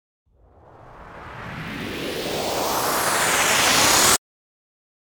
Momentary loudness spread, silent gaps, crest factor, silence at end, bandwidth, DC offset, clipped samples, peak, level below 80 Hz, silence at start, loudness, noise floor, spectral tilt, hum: 20 LU; none; 20 dB; 0.85 s; over 20 kHz; under 0.1%; under 0.1%; -4 dBFS; -50 dBFS; 0.8 s; -19 LUFS; -51 dBFS; -1 dB/octave; none